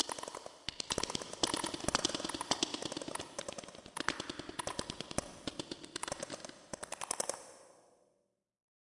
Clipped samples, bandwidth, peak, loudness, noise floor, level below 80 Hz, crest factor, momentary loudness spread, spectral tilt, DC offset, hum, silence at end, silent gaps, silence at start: under 0.1%; 11.5 kHz; -14 dBFS; -39 LUFS; -81 dBFS; -64 dBFS; 28 dB; 12 LU; -2 dB/octave; under 0.1%; none; 1.15 s; none; 0 s